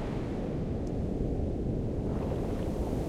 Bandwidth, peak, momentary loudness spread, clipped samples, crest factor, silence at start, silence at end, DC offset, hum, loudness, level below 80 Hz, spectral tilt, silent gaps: 14.5 kHz; -18 dBFS; 2 LU; under 0.1%; 14 dB; 0 s; 0 s; under 0.1%; none; -33 LUFS; -38 dBFS; -9 dB/octave; none